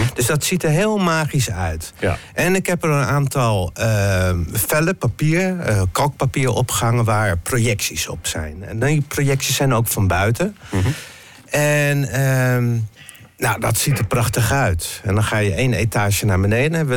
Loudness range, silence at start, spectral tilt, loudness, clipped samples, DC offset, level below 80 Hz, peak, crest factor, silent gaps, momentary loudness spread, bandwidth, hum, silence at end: 1 LU; 0 s; -5 dB/octave; -18 LUFS; under 0.1%; under 0.1%; -40 dBFS; -8 dBFS; 10 dB; none; 6 LU; 17.5 kHz; none; 0 s